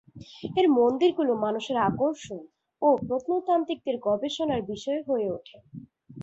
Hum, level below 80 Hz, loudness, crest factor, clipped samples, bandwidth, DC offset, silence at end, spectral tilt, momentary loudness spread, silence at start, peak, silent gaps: none; -62 dBFS; -26 LUFS; 18 dB; under 0.1%; 8 kHz; under 0.1%; 0 s; -6 dB/octave; 18 LU; 0.15 s; -10 dBFS; none